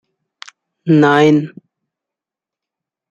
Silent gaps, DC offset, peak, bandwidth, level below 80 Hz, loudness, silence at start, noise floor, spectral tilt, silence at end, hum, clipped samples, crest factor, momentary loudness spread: none; under 0.1%; -2 dBFS; 7.6 kHz; -62 dBFS; -12 LUFS; 0.85 s; -87 dBFS; -7 dB/octave; 1.65 s; none; under 0.1%; 16 dB; 18 LU